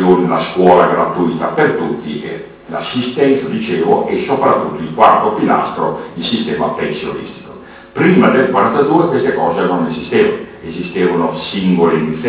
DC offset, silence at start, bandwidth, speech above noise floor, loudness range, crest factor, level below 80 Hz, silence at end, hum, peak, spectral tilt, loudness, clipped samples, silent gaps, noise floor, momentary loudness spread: under 0.1%; 0 s; 4 kHz; 21 dB; 3 LU; 14 dB; -48 dBFS; 0 s; none; 0 dBFS; -10.5 dB/octave; -14 LUFS; under 0.1%; none; -34 dBFS; 14 LU